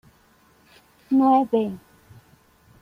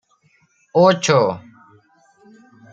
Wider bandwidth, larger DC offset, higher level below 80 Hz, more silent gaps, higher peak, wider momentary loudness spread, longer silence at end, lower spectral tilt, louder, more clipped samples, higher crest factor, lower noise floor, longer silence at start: second, 5.4 kHz vs 9.2 kHz; neither; about the same, -64 dBFS vs -64 dBFS; neither; second, -8 dBFS vs 0 dBFS; first, 14 LU vs 10 LU; second, 1.05 s vs 1.35 s; first, -8 dB/octave vs -5 dB/octave; second, -21 LUFS vs -16 LUFS; neither; about the same, 18 dB vs 20 dB; about the same, -58 dBFS vs -60 dBFS; first, 1.1 s vs 0.75 s